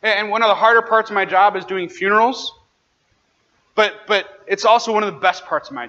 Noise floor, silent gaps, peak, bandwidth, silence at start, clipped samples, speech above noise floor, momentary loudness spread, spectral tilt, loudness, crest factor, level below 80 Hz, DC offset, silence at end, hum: -64 dBFS; none; -2 dBFS; 8 kHz; 0.05 s; under 0.1%; 47 dB; 11 LU; -3 dB/octave; -17 LUFS; 16 dB; -68 dBFS; under 0.1%; 0 s; none